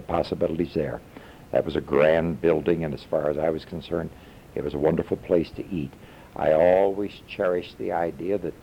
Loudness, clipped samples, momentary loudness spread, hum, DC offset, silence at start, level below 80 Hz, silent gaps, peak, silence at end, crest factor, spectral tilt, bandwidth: -25 LUFS; under 0.1%; 13 LU; none; under 0.1%; 0 s; -48 dBFS; none; -8 dBFS; 0.1 s; 16 dB; -8 dB/octave; 16 kHz